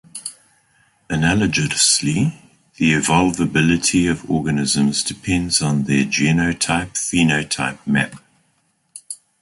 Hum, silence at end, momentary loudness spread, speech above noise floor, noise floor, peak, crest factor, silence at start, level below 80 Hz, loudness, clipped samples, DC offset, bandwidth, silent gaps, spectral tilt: none; 0.25 s; 9 LU; 46 dB; -64 dBFS; -2 dBFS; 18 dB; 0.15 s; -42 dBFS; -17 LUFS; under 0.1%; under 0.1%; 11.5 kHz; none; -3.5 dB/octave